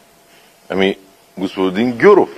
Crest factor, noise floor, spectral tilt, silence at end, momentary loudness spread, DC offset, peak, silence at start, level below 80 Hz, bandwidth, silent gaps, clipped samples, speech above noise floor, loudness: 16 dB; -48 dBFS; -6.5 dB/octave; 0.05 s; 15 LU; under 0.1%; 0 dBFS; 0.7 s; -58 dBFS; 12.5 kHz; none; under 0.1%; 35 dB; -15 LUFS